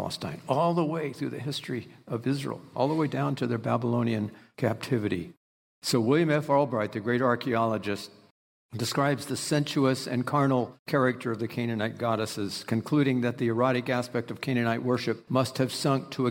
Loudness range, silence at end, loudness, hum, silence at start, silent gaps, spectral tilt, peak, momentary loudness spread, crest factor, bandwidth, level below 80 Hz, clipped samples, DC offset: 2 LU; 0 s; -28 LUFS; none; 0 s; 5.37-5.82 s, 8.31-8.69 s, 10.79-10.86 s; -6 dB/octave; -12 dBFS; 9 LU; 16 dB; 16.5 kHz; -70 dBFS; under 0.1%; under 0.1%